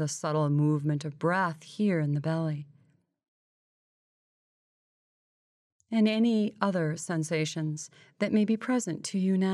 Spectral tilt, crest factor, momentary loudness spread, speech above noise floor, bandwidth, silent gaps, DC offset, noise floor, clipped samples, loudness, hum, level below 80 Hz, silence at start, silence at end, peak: -6 dB/octave; 18 dB; 8 LU; 37 dB; 12 kHz; 3.28-5.80 s; under 0.1%; -65 dBFS; under 0.1%; -29 LUFS; none; -80 dBFS; 0 s; 0 s; -10 dBFS